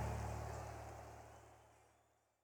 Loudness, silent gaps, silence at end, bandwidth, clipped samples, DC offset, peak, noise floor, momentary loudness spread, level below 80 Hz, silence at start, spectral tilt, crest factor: -50 LUFS; none; 0.45 s; 19.5 kHz; under 0.1%; under 0.1%; -32 dBFS; -77 dBFS; 20 LU; -56 dBFS; 0 s; -6 dB/octave; 18 dB